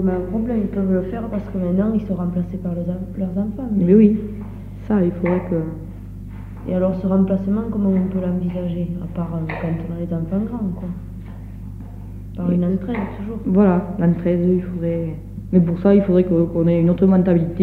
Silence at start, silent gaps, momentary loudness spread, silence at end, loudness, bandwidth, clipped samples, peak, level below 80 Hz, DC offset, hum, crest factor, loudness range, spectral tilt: 0 s; none; 18 LU; 0 s; -20 LUFS; 4.1 kHz; under 0.1%; -2 dBFS; -36 dBFS; under 0.1%; none; 16 dB; 7 LU; -11 dB/octave